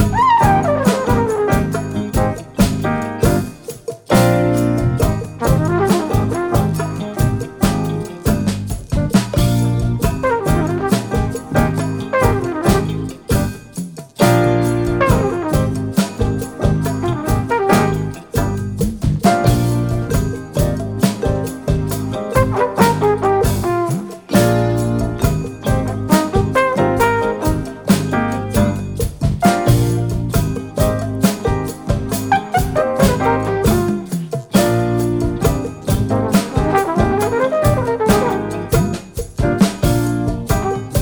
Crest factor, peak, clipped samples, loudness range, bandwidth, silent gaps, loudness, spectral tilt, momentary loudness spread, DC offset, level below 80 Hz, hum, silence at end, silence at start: 16 dB; 0 dBFS; under 0.1%; 2 LU; over 20 kHz; none; -17 LUFS; -6.5 dB/octave; 7 LU; under 0.1%; -28 dBFS; none; 0 s; 0 s